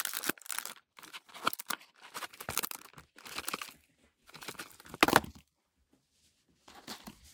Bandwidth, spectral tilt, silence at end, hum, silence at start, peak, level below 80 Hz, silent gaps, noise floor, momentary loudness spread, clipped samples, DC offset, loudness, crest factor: 19 kHz; -2 dB/octave; 0 s; none; 0 s; -4 dBFS; -66 dBFS; none; -77 dBFS; 22 LU; under 0.1%; under 0.1%; -35 LUFS; 34 dB